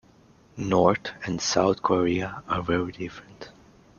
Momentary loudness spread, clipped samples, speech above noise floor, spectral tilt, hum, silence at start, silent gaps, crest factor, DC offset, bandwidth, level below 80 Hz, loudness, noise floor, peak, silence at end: 23 LU; under 0.1%; 31 dB; -5 dB/octave; none; 0.55 s; none; 22 dB; under 0.1%; 7.4 kHz; -54 dBFS; -25 LUFS; -56 dBFS; -4 dBFS; 0.5 s